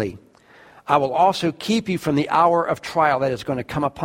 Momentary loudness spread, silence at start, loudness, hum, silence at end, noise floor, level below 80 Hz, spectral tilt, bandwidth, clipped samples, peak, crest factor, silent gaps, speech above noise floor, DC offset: 9 LU; 0 s; -20 LUFS; none; 0 s; -50 dBFS; -54 dBFS; -5.5 dB/octave; 16.5 kHz; under 0.1%; -2 dBFS; 18 dB; none; 30 dB; under 0.1%